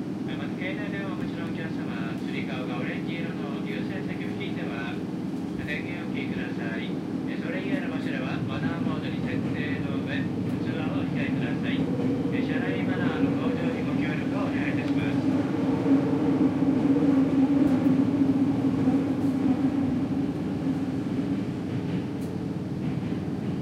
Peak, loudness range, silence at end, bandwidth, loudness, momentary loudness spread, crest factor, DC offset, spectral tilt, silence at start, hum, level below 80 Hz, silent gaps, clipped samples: -10 dBFS; 8 LU; 0 s; 10 kHz; -27 LUFS; 8 LU; 16 dB; under 0.1%; -8 dB/octave; 0 s; none; -56 dBFS; none; under 0.1%